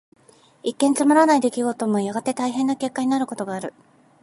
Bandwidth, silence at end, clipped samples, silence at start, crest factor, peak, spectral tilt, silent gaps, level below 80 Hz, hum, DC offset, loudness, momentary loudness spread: 11.5 kHz; 0.5 s; under 0.1%; 0.65 s; 18 dB; -4 dBFS; -4.5 dB/octave; none; -74 dBFS; none; under 0.1%; -21 LUFS; 14 LU